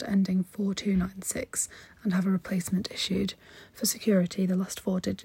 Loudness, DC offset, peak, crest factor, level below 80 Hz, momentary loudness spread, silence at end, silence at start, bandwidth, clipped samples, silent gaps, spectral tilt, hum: -29 LUFS; under 0.1%; -14 dBFS; 14 dB; -54 dBFS; 8 LU; 0 s; 0 s; 16.5 kHz; under 0.1%; none; -5 dB/octave; none